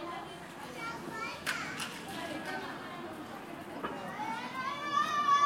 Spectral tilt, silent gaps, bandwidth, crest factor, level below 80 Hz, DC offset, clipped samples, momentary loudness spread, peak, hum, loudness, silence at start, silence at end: -3 dB/octave; none; 16.5 kHz; 18 dB; -72 dBFS; under 0.1%; under 0.1%; 13 LU; -18 dBFS; none; -37 LUFS; 0 s; 0 s